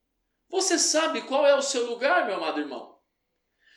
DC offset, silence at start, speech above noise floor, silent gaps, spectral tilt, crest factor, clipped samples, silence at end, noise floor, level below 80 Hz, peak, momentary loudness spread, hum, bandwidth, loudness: under 0.1%; 0.5 s; 53 dB; none; 0 dB/octave; 18 dB; under 0.1%; 0.9 s; -78 dBFS; -86 dBFS; -10 dBFS; 11 LU; none; 14.5 kHz; -24 LUFS